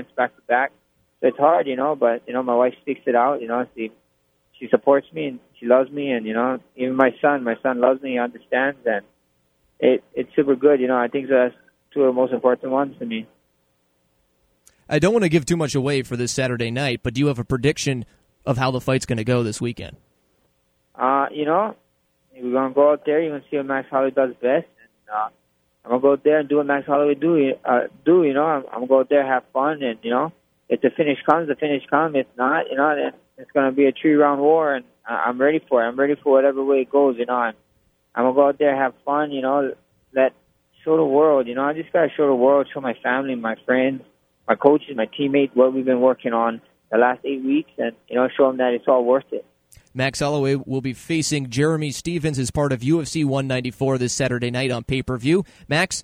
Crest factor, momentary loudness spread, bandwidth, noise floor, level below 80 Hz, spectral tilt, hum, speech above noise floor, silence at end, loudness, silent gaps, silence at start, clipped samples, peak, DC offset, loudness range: 20 dB; 9 LU; 14.5 kHz; -66 dBFS; -54 dBFS; -5.5 dB/octave; none; 47 dB; 0 s; -20 LUFS; none; 0 s; under 0.1%; 0 dBFS; under 0.1%; 4 LU